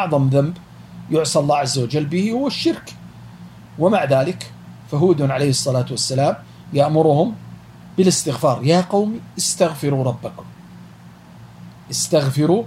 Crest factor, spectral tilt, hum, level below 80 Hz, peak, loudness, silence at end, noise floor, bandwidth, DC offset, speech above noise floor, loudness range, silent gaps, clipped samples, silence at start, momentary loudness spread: 16 dB; -5.5 dB/octave; none; -56 dBFS; -2 dBFS; -18 LUFS; 0 s; -42 dBFS; 16 kHz; under 0.1%; 24 dB; 3 LU; none; under 0.1%; 0 s; 19 LU